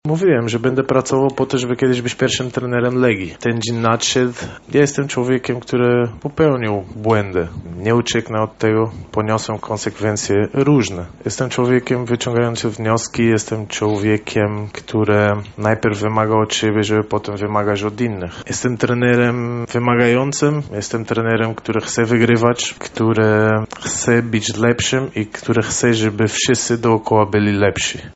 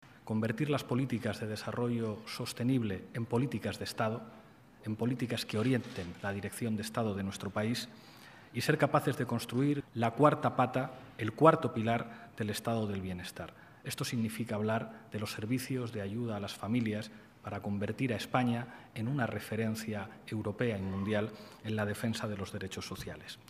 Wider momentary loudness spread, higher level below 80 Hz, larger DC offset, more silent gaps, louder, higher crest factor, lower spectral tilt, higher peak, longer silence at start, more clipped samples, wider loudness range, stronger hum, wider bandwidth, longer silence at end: second, 7 LU vs 12 LU; first, -48 dBFS vs -68 dBFS; neither; neither; first, -17 LUFS vs -34 LUFS; second, 16 dB vs 26 dB; about the same, -5 dB/octave vs -6 dB/octave; first, 0 dBFS vs -8 dBFS; about the same, 0.05 s vs 0 s; neither; second, 2 LU vs 6 LU; neither; second, 8.2 kHz vs 15.5 kHz; about the same, 0 s vs 0.1 s